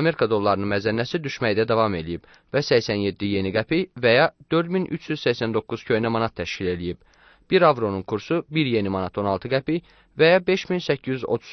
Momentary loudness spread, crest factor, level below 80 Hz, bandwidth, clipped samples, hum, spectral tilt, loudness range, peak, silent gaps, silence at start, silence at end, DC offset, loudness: 10 LU; 18 dB; -54 dBFS; 6.4 kHz; under 0.1%; none; -6.5 dB/octave; 2 LU; -4 dBFS; none; 0 s; 0 s; under 0.1%; -23 LUFS